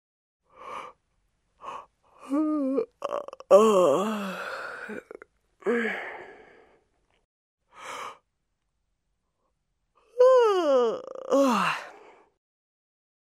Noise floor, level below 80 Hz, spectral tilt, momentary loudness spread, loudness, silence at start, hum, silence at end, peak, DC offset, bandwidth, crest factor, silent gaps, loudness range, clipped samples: -79 dBFS; -76 dBFS; -5 dB/octave; 22 LU; -24 LUFS; 0.6 s; none; 1.45 s; -4 dBFS; under 0.1%; 15 kHz; 24 dB; 7.25-7.58 s; 21 LU; under 0.1%